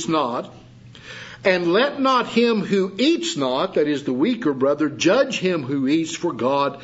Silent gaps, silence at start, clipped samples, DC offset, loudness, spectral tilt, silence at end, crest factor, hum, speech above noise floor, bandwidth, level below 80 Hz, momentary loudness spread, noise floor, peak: none; 0 s; under 0.1%; under 0.1%; -20 LUFS; -4.5 dB/octave; 0 s; 18 dB; none; 21 dB; 8 kHz; -62 dBFS; 7 LU; -41 dBFS; -2 dBFS